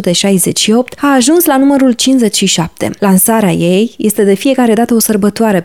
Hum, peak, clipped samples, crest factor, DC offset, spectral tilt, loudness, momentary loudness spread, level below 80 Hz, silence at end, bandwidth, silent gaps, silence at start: none; 0 dBFS; under 0.1%; 8 dB; 0.5%; -4 dB/octave; -9 LUFS; 4 LU; -48 dBFS; 0 s; 20 kHz; none; 0 s